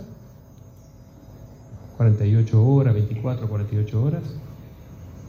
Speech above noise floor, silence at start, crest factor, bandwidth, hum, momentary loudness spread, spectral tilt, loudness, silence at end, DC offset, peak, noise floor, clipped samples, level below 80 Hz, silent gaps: 26 dB; 0 s; 16 dB; 6.8 kHz; none; 25 LU; -10 dB/octave; -21 LUFS; 0 s; under 0.1%; -8 dBFS; -46 dBFS; under 0.1%; -50 dBFS; none